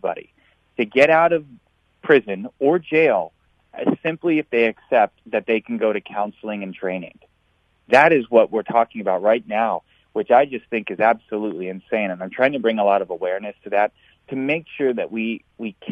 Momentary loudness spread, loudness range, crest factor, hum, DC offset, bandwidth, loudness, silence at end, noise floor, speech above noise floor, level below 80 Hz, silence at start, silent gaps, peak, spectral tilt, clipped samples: 13 LU; 3 LU; 20 dB; none; under 0.1%; 9.2 kHz; -20 LUFS; 0 s; -64 dBFS; 44 dB; -66 dBFS; 0.05 s; none; -2 dBFS; -6.5 dB/octave; under 0.1%